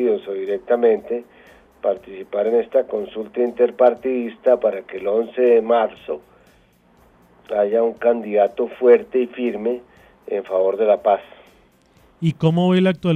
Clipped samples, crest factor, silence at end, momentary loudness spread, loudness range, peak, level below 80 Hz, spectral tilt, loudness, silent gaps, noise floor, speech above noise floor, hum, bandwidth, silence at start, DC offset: under 0.1%; 16 dB; 0 s; 11 LU; 3 LU; -2 dBFS; -60 dBFS; -8.5 dB/octave; -19 LUFS; none; -55 dBFS; 36 dB; none; 4.6 kHz; 0 s; under 0.1%